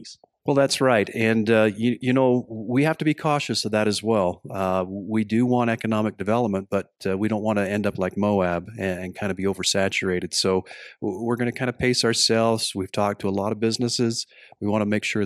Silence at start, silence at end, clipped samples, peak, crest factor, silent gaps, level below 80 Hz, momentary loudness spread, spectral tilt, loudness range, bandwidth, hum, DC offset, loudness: 0 s; 0 s; under 0.1%; -4 dBFS; 18 dB; none; -60 dBFS; 9 LU; -4.5 dB/octave; 3 LU; 14 kHz; none; under 0.1%; -23 LUFS